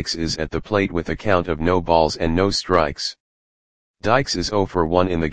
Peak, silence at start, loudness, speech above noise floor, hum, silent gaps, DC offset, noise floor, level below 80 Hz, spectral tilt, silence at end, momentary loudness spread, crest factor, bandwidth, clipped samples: 0 dBFS; 0 s; -20 LUFS; over 70 dB; none; 3.20-3.94 s; 1%; under -90 dBFS; -38 dBFS; -5 dB/octave; 0 s; 6 LU; 20 dB; 10 kHz; under 0.1%